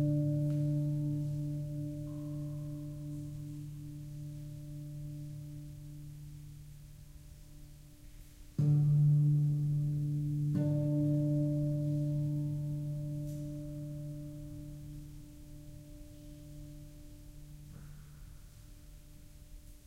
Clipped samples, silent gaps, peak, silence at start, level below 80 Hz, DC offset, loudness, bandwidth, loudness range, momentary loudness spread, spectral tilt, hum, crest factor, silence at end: under 0.1%; none; -22 dBFS; 0 s; -54 dBFS; under 0.1%; -35 LUFS; 12 kHz; 21 LU; 24 LU; -9.5 dB/octave; none; 14 dB; 0.05 s